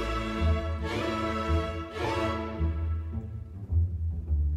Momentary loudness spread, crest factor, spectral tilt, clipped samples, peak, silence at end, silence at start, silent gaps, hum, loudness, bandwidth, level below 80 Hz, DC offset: 6 LU; 14 dB; -7 dB/octave; under 0.1%; -16 dBFS; 0 s; 0 s; none; none; -31 LUFS; 9.4 kHz; -34 dBFS; under 0.1%